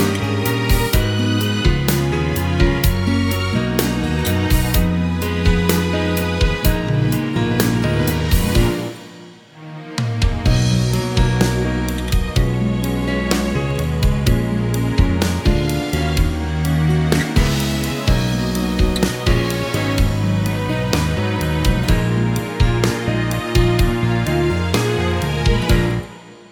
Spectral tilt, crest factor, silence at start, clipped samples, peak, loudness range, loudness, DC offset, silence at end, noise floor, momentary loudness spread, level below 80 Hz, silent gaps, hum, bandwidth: -5.5 dB/octave; 16 dB; 0 s; under 0.1%; 0 dBFS; 2 LU; -18 LUFS; under 0.1%; 0.15 s; -40 dBFS; 4 LU; -24 dBFS; none; none; 19 kHz